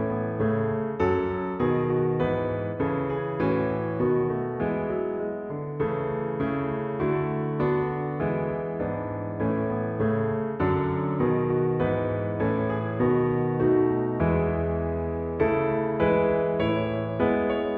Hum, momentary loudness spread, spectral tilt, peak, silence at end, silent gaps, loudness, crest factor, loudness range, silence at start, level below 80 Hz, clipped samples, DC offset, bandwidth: none; 6 LU; -10.5 dB/octave; -8 dBFS; 0 s; none; -26 LUFS; 16 dB; 3 LU; 0 s; -46 dBFS; under 0.1%; under 0.1%; 4.8 kHz